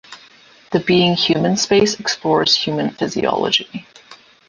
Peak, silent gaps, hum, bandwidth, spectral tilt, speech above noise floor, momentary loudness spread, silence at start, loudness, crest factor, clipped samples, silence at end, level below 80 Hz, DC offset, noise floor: -2 dBFS; none; none; 10 kHz; -4 dB/octave; 30 dB; 7 LU; 0.1 s; -16 LUFS; 16 dB; under 0.1%; 0.35 s; -54 dBFS; under 0.1%; -47 dBFS